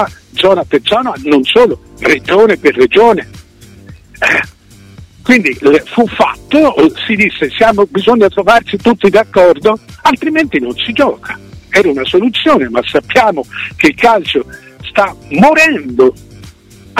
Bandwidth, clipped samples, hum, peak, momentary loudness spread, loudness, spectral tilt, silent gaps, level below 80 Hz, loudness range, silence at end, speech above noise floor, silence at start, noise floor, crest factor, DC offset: 16 kHz; 0.2%; none; 0 dBFS; 8 LU; -10 LUFS; -5 dB/octave; none; -40 dBFS; 2 LU; 0 s; 27 dB; 0 s; -37 dBFS; 10 dB; under 0.1%